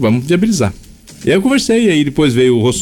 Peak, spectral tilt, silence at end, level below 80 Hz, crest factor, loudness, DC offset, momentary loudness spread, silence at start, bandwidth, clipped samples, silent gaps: -4 dBFS; -5.5 dB/octave; 0 s; -38 dBFS; 10 dB; -13 LUFS; under 0.1%; 5 LU; 0 s; 18.5 kHz; under 0.1%; none